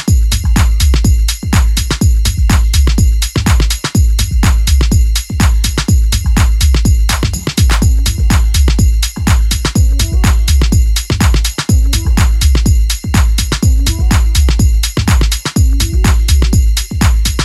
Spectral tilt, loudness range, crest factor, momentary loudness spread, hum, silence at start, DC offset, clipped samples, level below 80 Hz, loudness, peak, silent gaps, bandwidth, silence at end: -4.5 dB/octave; 0 LU; 10 dB; 2 LU; none; 0 s; under 0.1%; under 0.1%; -10 dBFS; -12 LUFS; 0 dBFS; none; 15 kHz; 0 s